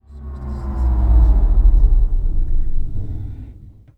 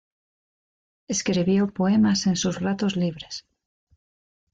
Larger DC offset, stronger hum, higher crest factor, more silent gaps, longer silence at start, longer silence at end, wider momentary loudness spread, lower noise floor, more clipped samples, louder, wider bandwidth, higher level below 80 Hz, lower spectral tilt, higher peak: neither; neither; about the same, 12 dB vs 14 dB; neither; second, 0.1 s vs 1.1 s; second, 0.35 s vs 1.2 s; first, 17 LU vs 12 LU; second, -39 dBFS vs under -90 dBFS; neither; first, -20 LUFS vs -23 LUFS; second, 1.8 kHz vs 9 kHz; first, -16 dBFS vs -58 dBFS; first, -10.5 dB/octave vs -5 dB/octave; first, -2 dBFS vs -12 dBFS